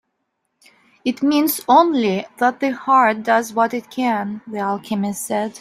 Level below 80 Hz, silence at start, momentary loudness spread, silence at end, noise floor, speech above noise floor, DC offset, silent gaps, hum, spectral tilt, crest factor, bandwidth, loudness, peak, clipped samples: -66 dBFS; 1.05 s; 10 LU; 0 s; -73 dBFS; 55 dB; under 0.1%; none; none; -4.5 dB/octave; 18 dB; 16 kHz; -18 LUFS; -2 dBFS; under 0.1%